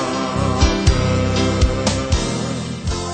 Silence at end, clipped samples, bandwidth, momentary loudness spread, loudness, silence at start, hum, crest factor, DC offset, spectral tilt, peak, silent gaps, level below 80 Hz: 0 s; under 0.1%; 9.2 kHz; 8 LU; -19 LUFS; 0 s; none; 16 dB; under 0.1%; -5 dB/octave; -2 dBFS; none; -24 dBFS